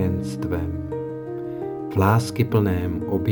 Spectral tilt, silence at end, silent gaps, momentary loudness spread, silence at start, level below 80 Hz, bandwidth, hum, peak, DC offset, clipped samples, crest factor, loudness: -7.5 dB/octave; 0 s; none; 11 LU; 0 s; -48 dBFS; 20 kHz; none; -4 dBFS; under 0.1%; under 0.1%; 18 dB; -24 LUFS